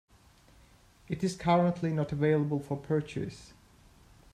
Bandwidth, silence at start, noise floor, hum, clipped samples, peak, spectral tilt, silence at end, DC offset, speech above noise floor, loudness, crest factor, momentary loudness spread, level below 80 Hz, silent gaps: 12 kHz; 1.1 s; -60 dBFS; none; under 0.1%; -14 dBFS; -7.5 dB/octave; 0.9 s; under 0.1%; 31 dB; -30 LUFS; 18 dB; 13 LU; -60 dBFS; none